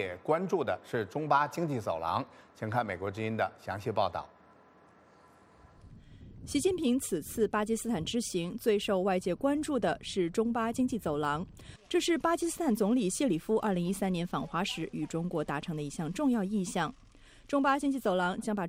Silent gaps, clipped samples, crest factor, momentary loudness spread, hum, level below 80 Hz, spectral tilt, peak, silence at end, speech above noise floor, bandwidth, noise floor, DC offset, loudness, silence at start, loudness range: none; under 0.1%; 20 dB; 7 LU; none; -58 dBFS; -5 dB/octave; -12 dBFS; 0 s; 29 dB; 16 kHz; -60 dBFS; under 0.1%; -32 LUFS; 0 s; 5 LU